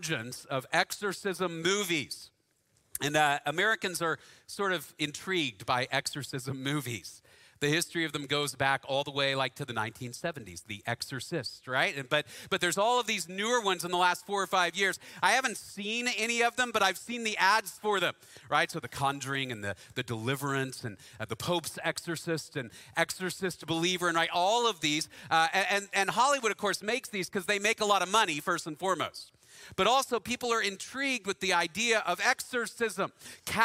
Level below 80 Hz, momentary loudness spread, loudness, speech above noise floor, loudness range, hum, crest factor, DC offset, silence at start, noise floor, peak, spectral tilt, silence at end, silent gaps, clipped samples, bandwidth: -68 dBFS; 11 LU; -30 LUFS; 41 dB; 5 LU; none; 22 dB; under 0.1%; 0 s; -72 dBFS; -10 dBFS; -3 dB/octave; 0 s; none; under 0.1%; 16 kHz